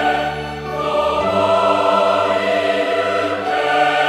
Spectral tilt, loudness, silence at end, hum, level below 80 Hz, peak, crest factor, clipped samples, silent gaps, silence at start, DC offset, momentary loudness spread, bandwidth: -4.5 dB/octave; -17 LUFS; 0 s; none; -46 dBFS; -2 dBFS; 14 dB; under 0.1%; none; 0 s; under 0.1%; 7 LU; 14 kHz